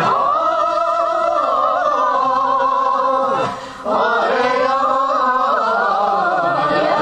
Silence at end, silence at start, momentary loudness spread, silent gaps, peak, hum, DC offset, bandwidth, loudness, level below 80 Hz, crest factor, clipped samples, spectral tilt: 0 s; 0 s; 1 LU; none; -2 dBFS; none; under 0.1%; 9.2 kHz; -16 LUFS; -54 dBFS; 14 dB; under 0.1%; -4.5 dB/octave